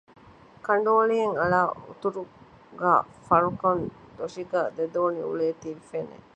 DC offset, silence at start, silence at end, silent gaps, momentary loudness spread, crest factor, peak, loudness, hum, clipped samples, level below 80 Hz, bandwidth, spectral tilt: under 0.1%; 0.65 s; 0.2 s; none; 15 LU; 20 dB; -6 dBFS; -25 LUFS; none; under 0.1%; -60 dBFS; 9 kHz; -7 dB/octave